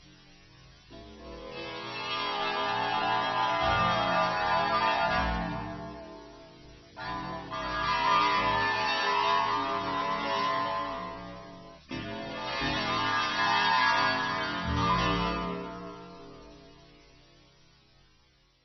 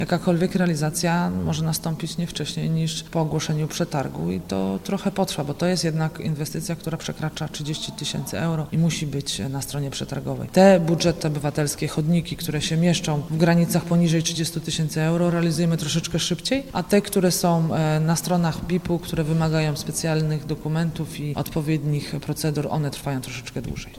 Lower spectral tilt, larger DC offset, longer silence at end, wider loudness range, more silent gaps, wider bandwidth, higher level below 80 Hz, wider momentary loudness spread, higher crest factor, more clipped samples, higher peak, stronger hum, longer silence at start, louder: second, -1.5 dB/octave vs -5.5 dB/octave; neither; first, 1.9 s vs 0 s; about the same, 6 LU vs 5 LU; neither; second, 6.2 kHz vs 16 kHz; about the same, -48 dBFS vs -46 dBFS; first, 20 LU vs 8 LU; about the same, 18 dB vs 20 dB; neither; second, -12 dBFS vs -4 dBFS; neither; about the same, 0.05 s vs 0 s; second, -28 LUFS vs -23 LUFS